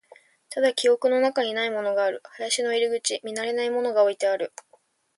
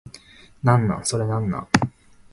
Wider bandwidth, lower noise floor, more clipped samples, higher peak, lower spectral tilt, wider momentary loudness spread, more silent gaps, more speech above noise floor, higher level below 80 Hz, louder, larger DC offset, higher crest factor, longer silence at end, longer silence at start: about the same, 11.5 kHz vs 11.5 kHz; first, -62 dBFS vs -47 dBFS; neither; second, -10 dBFS vs 0 dBFS; second, -1.5 dB/octave vs -5.5 dB/octave; about the same, 8 LU vs 6 LU; neither; first, 39 dB vs 27 dB; second, -78 dBFS vs -46 dBFS; about the same, -24 LUFS vs -22 LUFS; neither; second, 16 dB vs 22 dB; first, 0.7 s vs 0.45 s; first, 0.5 s vs 0.05 s